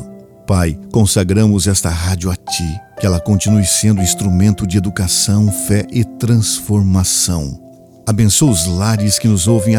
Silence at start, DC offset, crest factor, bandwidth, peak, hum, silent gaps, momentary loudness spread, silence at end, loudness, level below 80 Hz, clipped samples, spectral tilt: 0 s; under 0.1%; 14 dB; 19 kHz; 0 dBFS; none; none; 8 LU; 0 s; -14 LUFS; -32 dBFS; under 0.1%; -5 dB/octave